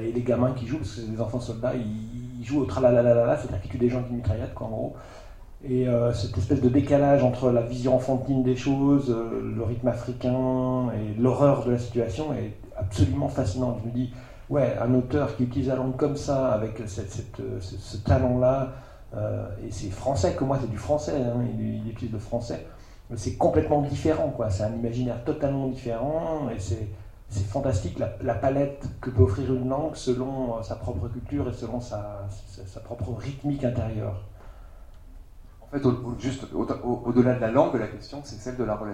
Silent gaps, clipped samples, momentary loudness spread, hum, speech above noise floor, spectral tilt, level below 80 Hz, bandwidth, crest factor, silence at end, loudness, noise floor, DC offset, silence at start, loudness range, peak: none; under 0.1%; 13 LU; none; 21 dB; -8 dB/octave; -44 dBFS; 11.5 kHz; 20 dB; 0 s; -26 LUFS; -46 dBFS; under 0.1%; 0 s; 8 LU; -4 dBFS